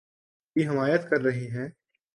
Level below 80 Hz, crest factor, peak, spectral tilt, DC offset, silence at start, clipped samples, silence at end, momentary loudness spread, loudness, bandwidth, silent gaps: -70 dBFS; 18 dB; -10 dBFS; -7.5 dB/octave; under 0.1%; 0.55 s; under 0.1%; 0.45 s; 11 LU; -27 LUFS; 11.5 kHz; none